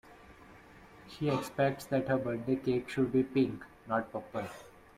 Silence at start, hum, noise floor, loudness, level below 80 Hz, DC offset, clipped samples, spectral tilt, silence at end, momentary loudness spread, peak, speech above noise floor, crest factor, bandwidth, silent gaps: 0.05 s; none; -55 dBFS; -33 LUFS; -64 dBFS; under 0.1%; under 0.1%; -7 dB/octave; 0.3 s; 12 LU; -16 dBFS; 23 dB; 18 dB; 16 kHz; none